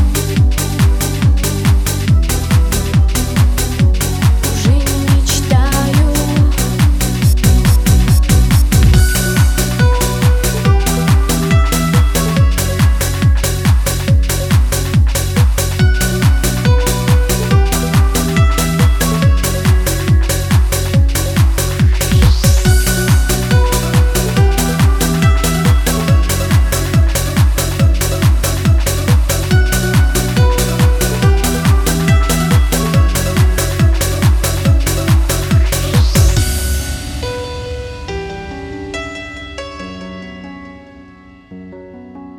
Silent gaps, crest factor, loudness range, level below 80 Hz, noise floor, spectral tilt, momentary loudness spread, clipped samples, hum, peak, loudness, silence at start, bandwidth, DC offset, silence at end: none; 12 dB; 4 LU; -16 dBFS; -39 dBFS; -5 dB/octave; 10 LU; under 0.1%; none; 0 dBFS; -13 LUFS; 0 s; 19 kHz; under 0.1%; 0.05 s